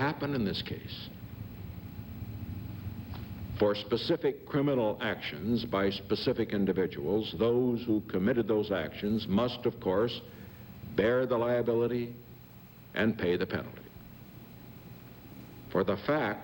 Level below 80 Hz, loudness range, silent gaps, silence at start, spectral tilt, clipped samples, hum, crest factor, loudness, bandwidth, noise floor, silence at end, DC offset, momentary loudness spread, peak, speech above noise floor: -56 dBFS; 6 LU; none; 0 s; -7.5 dB/octave; under 0.1%; none; 18 dB; -31 LUFS; 16 kHz; -52 dBFS; 0 s; under 0.1%; 20 LU; -14 dBFS; 21 dB